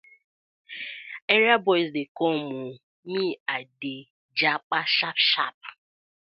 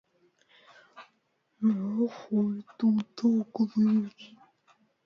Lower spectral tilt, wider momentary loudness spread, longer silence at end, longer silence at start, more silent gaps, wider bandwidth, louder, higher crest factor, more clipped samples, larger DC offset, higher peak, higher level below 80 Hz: second, -6.5 dB/octave vs -8.5 dB/octave; first, 19 LU vs 5 LU; second, 0.6 s vs 0.8 s; second, 0.7 s vs 0.95 s; first, 1.22-1.28 s, 2.08-2.15 s, 2.83-3.03 s, 3.40-3.46 s, 4.10-4.29 s, 4.63-4.70 s, 5.54-5.61 s vs none; about the same, 6 kHz vs 6.4 kHz; first, -24 LUFS vs -28 LUFS; first, 24 dB vs 14 dB; neither; neither; first, -4 dBFS vs -16 dBFS; about the same, -82 dBFS vs -78 dBFS